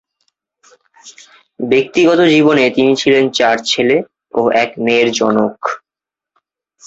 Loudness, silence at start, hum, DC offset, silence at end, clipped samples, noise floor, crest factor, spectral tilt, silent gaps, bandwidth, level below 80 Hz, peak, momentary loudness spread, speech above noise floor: -13 LUFS; 1.05 s; none; under 0.1%; 1.1 s; under 0.1%; -87 dBFS; 14 dB; -4.5 dB/octave; none; 8 kHz; -56 dBFS; 0 dBFS; 11 LU; 75 dB